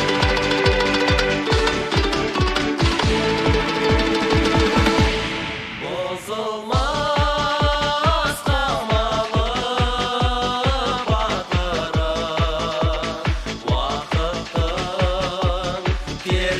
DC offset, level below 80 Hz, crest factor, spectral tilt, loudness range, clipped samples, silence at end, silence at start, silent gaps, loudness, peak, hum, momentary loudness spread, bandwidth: under 0.1%; -28 dBFS; 18 dB; -5 dB/octave; 4 LU; under 0.1%; 0 s; 0 s; none; -20 LUFS; -2 dBFS; none; 7 LU; 15 kHz